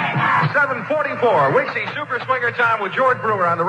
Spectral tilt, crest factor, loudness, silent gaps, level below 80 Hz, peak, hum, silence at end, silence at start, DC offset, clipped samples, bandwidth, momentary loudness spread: -6.5 dB/octave; 14 dB; -18 LUFS; none; -66 dBFS; -4 dBFS; none; 0 s; 0 s; under 0.1%; under 0.1%; 9.6 kHz; 6 LU